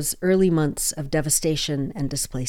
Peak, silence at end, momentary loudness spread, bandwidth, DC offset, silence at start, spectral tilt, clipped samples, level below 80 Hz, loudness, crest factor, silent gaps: -8 dBFS; 0 s; 7 LU; 18 kHz; under 0.1%; 0 s; -4.5 dB/octave; under 0.1%; -40 dBFS; -22 LUFS; 16 dB; none